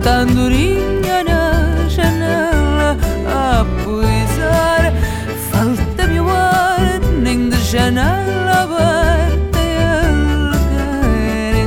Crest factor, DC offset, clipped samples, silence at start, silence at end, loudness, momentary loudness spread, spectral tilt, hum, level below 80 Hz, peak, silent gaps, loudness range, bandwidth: 12 dB; under 0.1%; under 0.1%; 0 s; 0 s; -15 LUFS; 4 LU; -6 dB/octave; none; -18 dBFS; -2 dBFS; none; 1 LU; 17.5 kHz